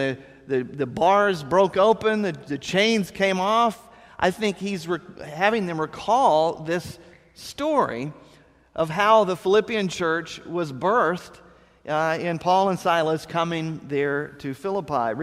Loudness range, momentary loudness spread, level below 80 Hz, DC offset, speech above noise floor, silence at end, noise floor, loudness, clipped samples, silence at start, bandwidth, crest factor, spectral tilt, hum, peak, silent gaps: 3 LU; 12 LU; -58 dBFS; under 0.1%; 29 dB; 0 s; -51 dBFS; -23 LUFS; under 0.1%; 0 s; 15 kHz; 18 dB; -5 dB/octave; none; -4 dBFS; none